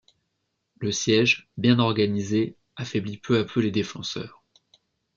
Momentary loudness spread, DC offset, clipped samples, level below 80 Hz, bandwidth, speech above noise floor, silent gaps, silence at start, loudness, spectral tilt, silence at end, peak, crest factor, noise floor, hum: 12 LU; under 0.1%; under 0.1%; -64 dBFS; 7.6 kHz; 53 dB; none; 0.8 s; -24 LUFS; -5 dB/octave; 0.9 s; -6 dBFS; 20 dB; -77 dBFS; none